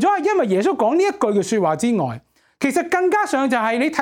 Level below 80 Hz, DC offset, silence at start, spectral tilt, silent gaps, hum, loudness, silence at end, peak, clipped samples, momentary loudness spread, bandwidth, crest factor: -64 dBFS; under 0.1%; 0 s; -5 dB/octave; none; none; -19 LUFS; 0 s; 0 dBFS; under 0.1%; 4 LU; 17 kHz; 18 dB